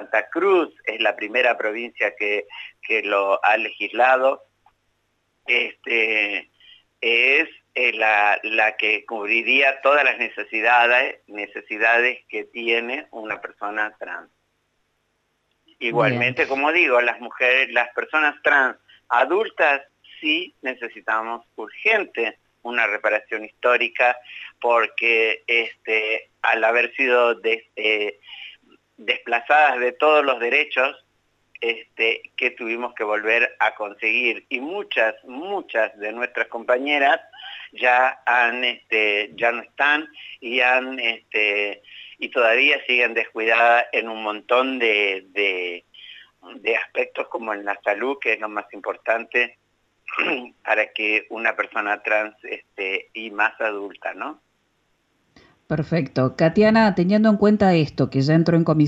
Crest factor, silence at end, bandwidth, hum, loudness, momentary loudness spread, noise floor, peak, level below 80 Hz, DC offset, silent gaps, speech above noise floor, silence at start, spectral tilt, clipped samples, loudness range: 18 dB; 0 s; 8 kHz; 50 Hz at -70 dBFS; -20 LUFS; 13 LU; -70 dBFS; -4 dBFS; -64 dBFS; under 0.1%; none; 49 dB; 0 s; -6 dB/octave; under 0.1%; 6 LU